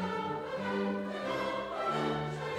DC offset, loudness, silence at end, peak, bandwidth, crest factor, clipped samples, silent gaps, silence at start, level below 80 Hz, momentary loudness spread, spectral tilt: under 0.1%; -35 LUFS; 0 s; -22 dBFS; 14 kHz; 14 dB; under 0.1%; none; 0 s; -64 dBFS; 3 LU; -6 dB/octave